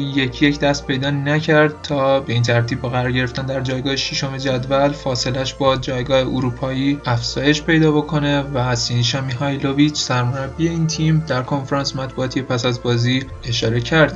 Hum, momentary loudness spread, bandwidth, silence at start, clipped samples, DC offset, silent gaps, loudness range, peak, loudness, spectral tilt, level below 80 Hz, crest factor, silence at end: none; 6 LU; 8 kHz; 0 s; under 0.1%; under 0.1%; none; 2 LU; 0 dBFS; -18 LUFS; -5.5 dB/octave; -38 dBFS; 18 dB; 0 s